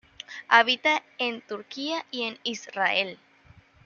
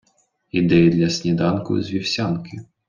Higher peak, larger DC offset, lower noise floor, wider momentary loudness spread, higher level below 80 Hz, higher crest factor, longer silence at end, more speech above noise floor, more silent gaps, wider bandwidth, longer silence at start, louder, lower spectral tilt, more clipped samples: about the same, -2 dBFS vs -4 dBFS; neither; second, -56 dBFS vs -64 dBFS; first, 17 LU vs 11 LU; second, -72 dBFS vs -52 dBFS; first, 24 dB vs 16 dB; first, 0.7 s vs 0.25 s; second, 30 dB vs 45 dB; neither; about the same, 7.2 kHz vs 7.4 kHz; second, 0.3 s vs 0.55 s; second, -25 LUFS vs -20 LUFS; second, -2 dB/octave vs -6 dB/octave; neither